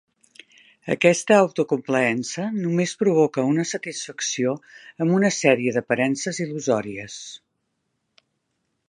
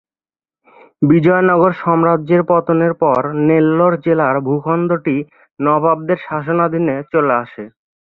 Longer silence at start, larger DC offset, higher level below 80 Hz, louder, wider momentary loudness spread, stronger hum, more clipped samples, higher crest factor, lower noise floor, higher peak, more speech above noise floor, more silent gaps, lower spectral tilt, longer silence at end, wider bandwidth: second, 0.85 s vs 1 s; neither; second, -70 dBFS vs -56 dBFS; second, -22 LUFS vs -15 LUFS; first, 14 LU vs 8 LU; neither; neither; first, 22 dB vs 14 dB; second, -75 dBFS vs under -90 dBFS; about the same, -2 dBFS vs 0 dBFS; second, 53 dB vs over 76 dB; second, none vs 5.51-5.55 s; second, -4.5 dB/octave vs -11 dB/octave; first, 1.5 s vs 0.35 s; first, 11.5 kHz vs 4.2 kHz